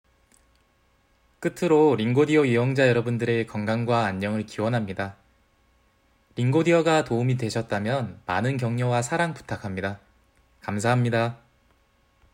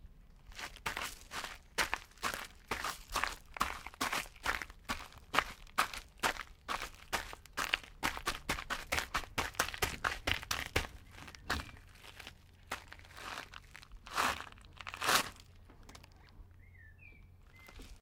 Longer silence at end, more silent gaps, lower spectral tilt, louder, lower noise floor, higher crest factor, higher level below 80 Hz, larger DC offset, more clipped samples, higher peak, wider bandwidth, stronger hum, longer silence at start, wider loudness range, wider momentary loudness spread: first, 1 s vs 0 s; neither; first, -6.5 dB/octave vs -2 dB/octave; first, -24 LUFS vs -38 LUFS; first, -64 dBFS vs -58 dBFS; second, 18 dB vs 32 dB; second, -62 dBFS vs -54 dBFS; neither; neither; about the same, -8 dBFS vs -8 dBFS; second, 15.5 kHz vs 17.5 kHz; neither; first, 1.4 s vs 0 s; about the same, 5 LU vs 5 LU; second, 12 LU vs 19 LU